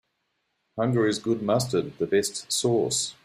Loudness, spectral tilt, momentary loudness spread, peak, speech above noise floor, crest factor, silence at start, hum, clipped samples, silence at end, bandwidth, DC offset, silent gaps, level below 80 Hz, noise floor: -25 LUFS; -4.5 dB/octave; 4 LU; -10 dBFS; 51 dB; 16 dB; 0.75 s; none; under 0.1%; 0.15 s; 15 kHz; under 0.1%; none; -62 dBFS; -76 dBFS